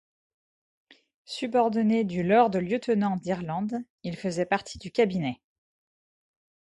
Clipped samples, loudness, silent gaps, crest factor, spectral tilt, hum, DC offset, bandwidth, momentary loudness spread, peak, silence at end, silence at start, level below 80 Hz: under 0.1%; -27 LUFS; 3.90-3.98 s; 20 dB; -6.5 dB/octave; none; under 0.1%; 11 kHz; 12 LU; -8 dBFS; 1.3 s; 1.3 s; -62 dBFS